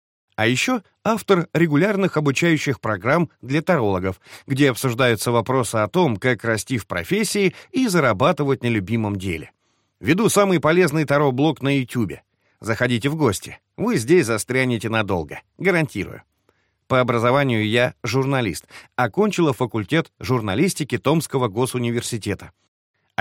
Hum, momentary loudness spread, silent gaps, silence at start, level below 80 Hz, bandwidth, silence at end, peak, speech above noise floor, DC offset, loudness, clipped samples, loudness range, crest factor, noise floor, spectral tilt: none; 9 LU; none; 0.4 s; -54 dBFS; 17 kHz; 0.7 s; -4 dBFS; 45 dB; under 0.1%; -20 LUFS; under 0.1%; 2 LU; 16 dB; -65 dBFS; -5.5 dB/octave